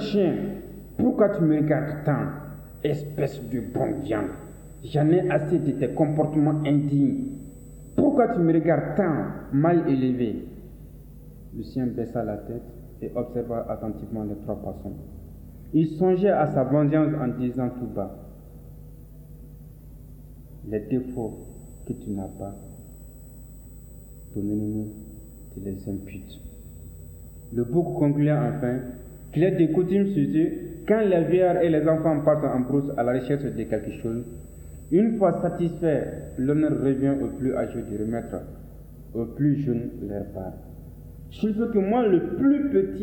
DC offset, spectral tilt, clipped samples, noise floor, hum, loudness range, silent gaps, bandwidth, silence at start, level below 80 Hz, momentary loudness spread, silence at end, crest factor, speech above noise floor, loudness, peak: under 0.1%; -9 dB/octave; under 0.1%; -44 dBFS; none; 12 LU; none; 19 kHz; 0 s; -46 dBFS; 23 LU; 0 s; 18 dB; 20 dB; -25 LUFS; -6 dBFS